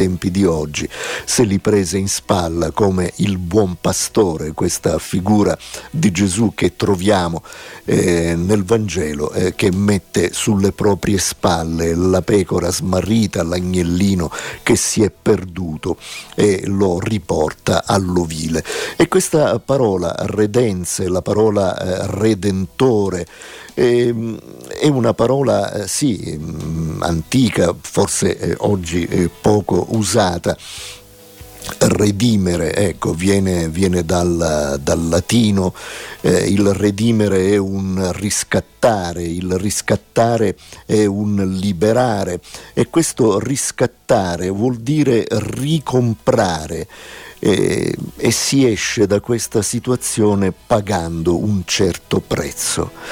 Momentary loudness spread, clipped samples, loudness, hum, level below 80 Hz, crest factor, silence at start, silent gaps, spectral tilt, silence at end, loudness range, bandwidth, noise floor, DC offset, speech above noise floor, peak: 8 LU; under 0.1%; -17 LUFS; none; -40 dBFS; 14 dB; 0 s; none; -5 dB/octave; 0 s; 2 LU; 18 kHz; -40 dBFS; under 0.1%; 23 dB; -2 dBFS